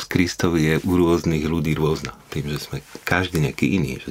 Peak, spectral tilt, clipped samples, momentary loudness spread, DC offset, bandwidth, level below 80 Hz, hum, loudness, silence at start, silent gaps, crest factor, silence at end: -2 dBFS; -6 dB/octave; under 0.1%; 11 LU; under 0.1%; 16 kHz; -40 dBFS; none; -21 LUFS; 0 s; none; 20 dB; 0 s